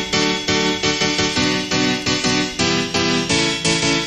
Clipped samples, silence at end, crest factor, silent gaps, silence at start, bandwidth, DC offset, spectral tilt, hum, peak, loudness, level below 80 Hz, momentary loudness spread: under 0.1%; 0 s; 14 dB; none; 0 s; 15 kHz; 0.3%; -3 dB/octave; none; -4 dBFS; -17 LUFS; -44 dBFS; 2 LU